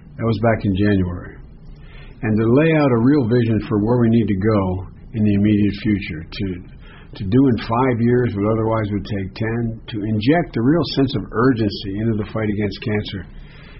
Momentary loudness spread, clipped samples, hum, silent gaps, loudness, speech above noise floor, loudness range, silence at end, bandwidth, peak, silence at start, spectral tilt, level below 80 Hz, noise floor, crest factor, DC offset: 12 LU; under 0.1%; none; none; -19 LUFS; 20 dB; 3 LU; 0 s; 5.8 kHz; -4 dBFS; 0.05 s; -7 dB/octave; -38 dBFS; -38 dBFS; 14 dB; under 0.1%